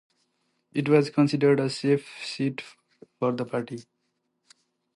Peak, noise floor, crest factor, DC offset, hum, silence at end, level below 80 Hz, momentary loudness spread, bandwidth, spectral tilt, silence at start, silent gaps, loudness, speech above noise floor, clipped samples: -8 dBFS; -76 dBFS; 20 dB; under 0.1%; none; 1.15 s; -74 dBFS; 17 LU; 11.5 kHz; -6.5 dB/octave; 0.75 s; none; -25 LUFS; 52 dB; under 0.1%